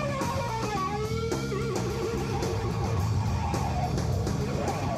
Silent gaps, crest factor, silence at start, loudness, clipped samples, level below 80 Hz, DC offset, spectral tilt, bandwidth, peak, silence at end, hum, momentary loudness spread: none; 12 dB; 0 s; -29 LUFS; under 0.1%; -40 dBFS; under 0.1%; -6 dB/octave; 15 kHz; -16 dBFS; 0 s; none; 2 LU